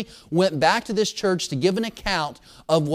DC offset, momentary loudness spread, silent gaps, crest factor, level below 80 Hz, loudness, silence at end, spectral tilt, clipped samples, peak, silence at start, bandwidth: under 0.1%; 7 LU; none; 18 dB; -48 dBFS; -23 LUFS; 0 s; -4.5 dB/octave; under 0.1%; -4 dBFS; 0 s; 15.5 kHz